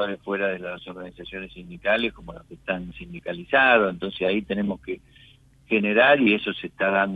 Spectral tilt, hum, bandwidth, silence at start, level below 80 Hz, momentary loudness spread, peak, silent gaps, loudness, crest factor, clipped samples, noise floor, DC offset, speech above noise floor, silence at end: -7 dB/octave; none; 4.8 kHz; 0 s; -54 dBFS; 20 LU; -6 dBFS; none; -22 LUFS; 18 dB; under 0.1%; -54 dBFS; under 0.1%; 30 dB; 0 s